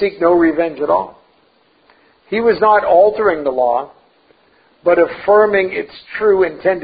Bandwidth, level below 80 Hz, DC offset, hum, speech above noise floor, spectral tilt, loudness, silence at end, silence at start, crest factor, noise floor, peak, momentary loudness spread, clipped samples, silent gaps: 5 kHz; -52 dBFS; under 0.1%; none; 41 dB; -11 dB/octave; -14 LUFS; 0 s; 0 s; 14 dB; -55 dBFS; 0 dBFS; 10 LU; under 0.1%; none